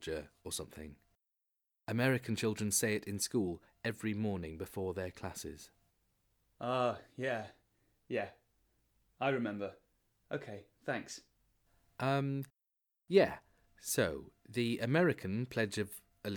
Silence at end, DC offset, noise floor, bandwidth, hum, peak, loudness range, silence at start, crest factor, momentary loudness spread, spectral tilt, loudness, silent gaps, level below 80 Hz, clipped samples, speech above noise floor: 0 s; under 0.1%; -87 dBFS; over 20 kHz; none; -14 dBFS; 7 LU; 0 s; 24 dB; 16 LU; -4.5 dB/octave; -37 LUFS; none; -66 dBFS; under 0.1%; 51 dB